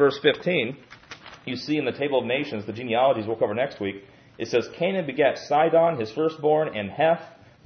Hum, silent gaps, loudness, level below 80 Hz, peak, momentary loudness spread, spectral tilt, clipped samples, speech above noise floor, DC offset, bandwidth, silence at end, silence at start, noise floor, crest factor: none; none; -24 LUFS; -68 dBFS; -6 dBFS; 13 LU; -6 dB/octave; under 0.1%; 21 dB; under 0.1%; 6.6 kHz; 0.35 s; 0 s; -45 dBFS; 18 dB